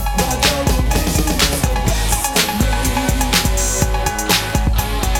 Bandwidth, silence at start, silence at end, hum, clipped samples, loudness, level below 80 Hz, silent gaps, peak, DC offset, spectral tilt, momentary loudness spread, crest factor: 18.5 kHz; 0 s; 0 s; none; under 0.1%; -16 LUFS; -20 dBFS; none; 0 dBFS; under 0.1%; -3.5 dB/octave; 3 LU; 16 dB